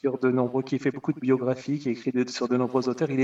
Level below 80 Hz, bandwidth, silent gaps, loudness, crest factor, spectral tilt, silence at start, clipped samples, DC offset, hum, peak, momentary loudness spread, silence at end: -72 dBFS; 7.8 kHz; none; -26 LUFS; 16 dB; -7 dB/octave; 0.05 s; under 0.1%; under 0.1%; none; -10 dBFS; 4 LU; 0 s